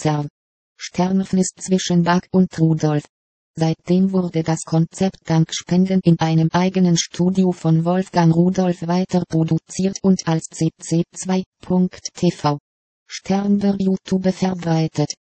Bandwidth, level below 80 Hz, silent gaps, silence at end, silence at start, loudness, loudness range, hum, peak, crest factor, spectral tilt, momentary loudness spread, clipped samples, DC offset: 8.8 kHz; -54 dBFS; 0.30-0.76 s, 3.09-3.54 s, 11.46-11.52 s, 12.60-13.06 s; 0.25 s; 0 s; -19 LUFS; 4 LU; none; -2 dBFS; 16 dB; -6.5 dB/octave; 7 LU; under 0.1%; under 0.1%